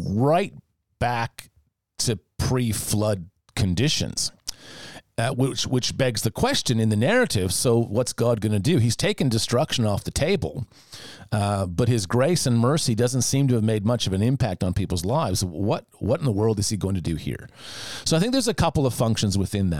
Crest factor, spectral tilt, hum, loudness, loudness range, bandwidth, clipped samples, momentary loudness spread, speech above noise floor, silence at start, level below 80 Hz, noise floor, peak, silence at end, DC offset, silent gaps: 16 dB; -5 dB/octave; none; -23 LUFS; 4 LU; 17 kHz; under 0.1%; 11 LU; 20 dB; 0 s; -46 dBFS; -43 dBFS; -8 dBFS; 0 s; 0.5%; none